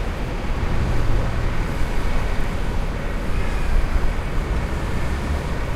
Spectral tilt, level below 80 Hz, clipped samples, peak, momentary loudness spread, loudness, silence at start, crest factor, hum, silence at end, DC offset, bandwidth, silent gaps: -6.5 dB/octave; -22 dBFS; under 0.1%; -6 dBFS; 3 LU; -25 LUFS; 0 s; 14 dB; none; 0 s; under 0.1%; 13 kHz; none